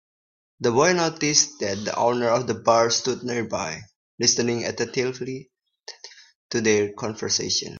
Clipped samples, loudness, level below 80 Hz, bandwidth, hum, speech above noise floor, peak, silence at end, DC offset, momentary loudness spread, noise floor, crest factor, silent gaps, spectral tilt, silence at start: under 0.1%; -22 LUFS; -64 dBFS; 7.6 kHz; none; 23 dB; -2 dBFS; 0 s; under 0.1%; 14 LU; -46 dBFS; 22 dB; 3.96-4.18 s, 6.35-6.49 s; -3 dB/octave; 0.6 s